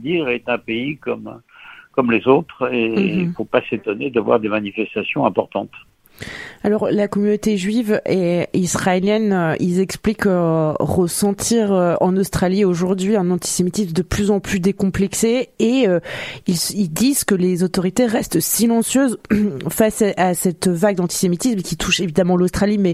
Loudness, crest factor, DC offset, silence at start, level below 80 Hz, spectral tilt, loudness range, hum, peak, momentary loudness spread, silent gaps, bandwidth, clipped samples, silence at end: -18 LUFS; 18 dB; under 0.1%; 0 s; -44 dBFS; -5 dB/octave; 3 LU; none; 0 dBFS; 6 LU; none; 15.5 kHz; under 0.1%; 0 s